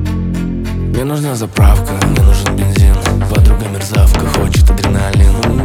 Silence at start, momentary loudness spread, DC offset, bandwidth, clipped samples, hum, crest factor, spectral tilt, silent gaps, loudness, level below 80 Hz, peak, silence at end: 0 s; 6 LU; under 0.1%; 16 kHz; under 0.1%; none; 10 dB; -6 dB/octave; none; -12 LUFS; -12 dBFS; 0 dBFS; 0 s